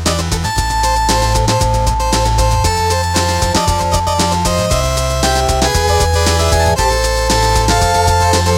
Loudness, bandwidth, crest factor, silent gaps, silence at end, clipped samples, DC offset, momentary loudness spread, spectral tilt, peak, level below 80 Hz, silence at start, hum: -13 LUFS; 16.5 kHz; 12 dB; none; 0 s; under 0.1%; under 0.1%; 3 LU; -4 dB/octave; -2 dBFS; -20 dBFS; 0 s; none